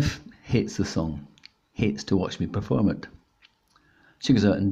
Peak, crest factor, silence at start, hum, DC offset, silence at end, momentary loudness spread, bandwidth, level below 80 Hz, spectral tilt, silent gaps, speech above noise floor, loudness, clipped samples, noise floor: -8 dBFS; 18 dB; 0 s; none; under 0.1%; 0 s; 17 LU; 8.6 kHz; -48 dBFS; -6.5 dB/octave; none; 39 dB; -26 LUFS; under 0.1%; -63 dBFS